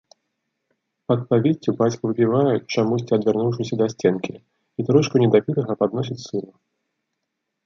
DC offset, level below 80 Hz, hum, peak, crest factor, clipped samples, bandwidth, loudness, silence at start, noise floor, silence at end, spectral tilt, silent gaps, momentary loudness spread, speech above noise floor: under 0.1%; -62 dBFS; none; -4 dBFS; 18 dB; under 0.1%; 7.4 kHz; -21 LUFS; 1.1 s; -79 dBFS; 1.2 s; -7 dB/octave; none; 11 LU; 59 dB